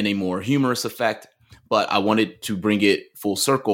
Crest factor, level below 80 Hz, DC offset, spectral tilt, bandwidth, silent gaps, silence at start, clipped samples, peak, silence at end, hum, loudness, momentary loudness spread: 18 dB; -64 dBFS; under 0.1%; -4.5 dB/octave; 17 kHz; none; 0 s; under 0.1%; -4 dBFS; 0 s; none; -22 LUFS; 6 LU